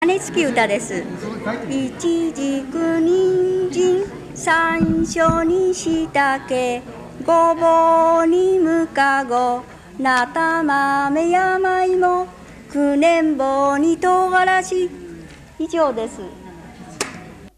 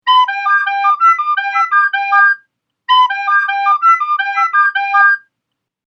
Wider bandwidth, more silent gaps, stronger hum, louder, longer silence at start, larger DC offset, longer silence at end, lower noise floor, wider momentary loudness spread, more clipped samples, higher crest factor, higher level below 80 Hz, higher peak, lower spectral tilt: first, 13 kHz vs 8.4 kHz; neither; neither; second, -18 LUFS vs -12 LUFS; about the same, 0 s vs 0.05 s; neither; second, 0.1 s vs 0.7 s; second, -38 dBFS vs -77 dBFS; first, 13 LU vs 4 LU; neither; about the same, 14 dB vs 14 dB; first, -46 dBFS vs under -90 dBFS; second, -4 dBFS vs 0 dBFS; first, -4.5 dB/octave vs 4 dB/octave